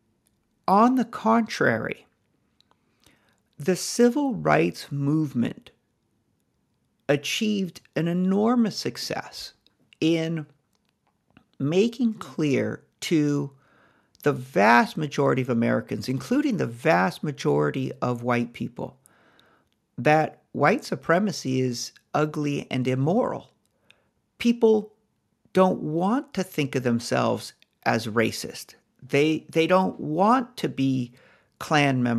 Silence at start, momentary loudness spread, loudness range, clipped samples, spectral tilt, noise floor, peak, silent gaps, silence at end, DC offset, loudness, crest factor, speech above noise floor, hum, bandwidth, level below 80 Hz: 0.7 s; 12 LU; 4 LU; under 0.1%; -5.5 dB/octave; -71 dBFS; -4 dBFS; none; 0 s; under 0.1%; -24 LUFS; 22 dB; 48 dB; none; 14 kHz; -66 dBFS